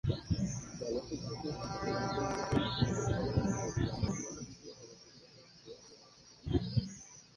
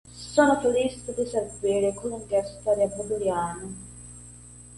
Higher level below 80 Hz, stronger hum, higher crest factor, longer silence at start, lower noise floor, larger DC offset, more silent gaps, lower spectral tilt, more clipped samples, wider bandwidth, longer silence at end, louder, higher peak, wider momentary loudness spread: about the same, -50 dBFS vs -52 dBFS; second, none vs 60 Hz at -45 dBFS; about the same, 20 dB vs 20 dB; about the same, 0.05 s vs 0.05 s; first, -59 dBFS vs -46 dBFS; neither; neither; about the same, -5.5 dB/octave vs -4.5 dB/octave; neither; about the same, 10.5 kHz vs 11.5 kHz; first, 0.15 s vs 0 s; second, -36 LUFS vs -26 LUFS; second, -16 dBFS vs -6 dBFS; about the same, 21 LU vs 22 LU